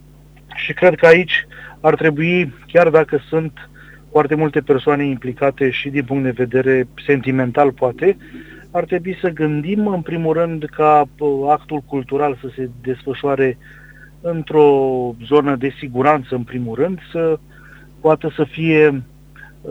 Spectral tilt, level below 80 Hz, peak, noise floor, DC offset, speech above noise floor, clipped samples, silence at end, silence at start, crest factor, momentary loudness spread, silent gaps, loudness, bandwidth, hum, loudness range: -8 dB/octave; -48 dBFS; 0 dBFS; -44 dBFS; under 0.1%; 28 dB; under 0.1%; 0 s; 0.5 s; 16 dB; 12 LU; none; -17 LUFS; 8 kHz; none; 4 LU